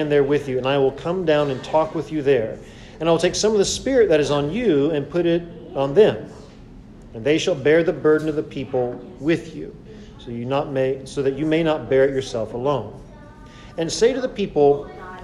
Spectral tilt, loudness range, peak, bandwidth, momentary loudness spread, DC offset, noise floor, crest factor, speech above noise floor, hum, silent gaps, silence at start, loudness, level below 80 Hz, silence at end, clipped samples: -5 dB/octave; 4 LU; -4 dBFS; 11.5 kHz; 14 LU; under 0.1%; -42 dBFS; 18 dB; 22 dB; none; none; 0 s; -20 LUFS; -46 dBFS; 0 s; under 0.1%